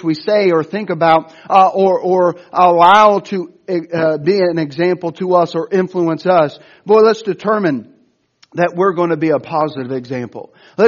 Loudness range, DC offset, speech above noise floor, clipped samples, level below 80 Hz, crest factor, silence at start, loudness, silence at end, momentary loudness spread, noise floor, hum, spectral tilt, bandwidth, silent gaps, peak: 5 LU; under 0.1%; 42 dB; under 0.1%; -62 dBFS; 14 dB; 0.05 s; -14 LUFS; 0 s; 13 LU; -56 dBFS; none; -7 dB/octave; 7.2 kHz; none; 0 dBFS